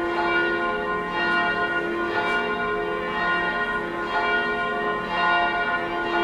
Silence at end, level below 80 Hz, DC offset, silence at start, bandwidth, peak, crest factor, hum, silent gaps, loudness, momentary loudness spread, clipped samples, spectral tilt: 0 s; -50 dBFS; under 0.1%; 0 s; 13 kHz; -10 dBFS; 14 dB; none; none; -23 LUFS; 4 LU; under 0.1%; -5 dB/octave